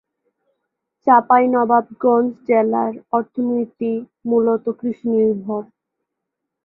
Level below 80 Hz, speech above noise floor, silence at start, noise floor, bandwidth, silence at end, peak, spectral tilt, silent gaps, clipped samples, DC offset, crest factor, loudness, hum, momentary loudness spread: -66 dBFS; 63 dB; 1.05 s; -80 dBFS; 3.2 kHz; 1 s; -2 dBFS; -11 dB/octave; none; under 0.1%; under 0.1%; 16 dB; -18 LUFS; none; 10 LU